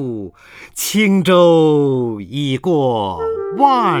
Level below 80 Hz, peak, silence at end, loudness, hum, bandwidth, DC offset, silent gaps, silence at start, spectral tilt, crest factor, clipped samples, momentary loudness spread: -52 dBFS; 0 dBFS; 0 s; -15 LUFS; none; over 20 kHz; under 0.1%; none; 0 s; -5.5 dB/octave; 14 dB; under 0.1%; 13 LU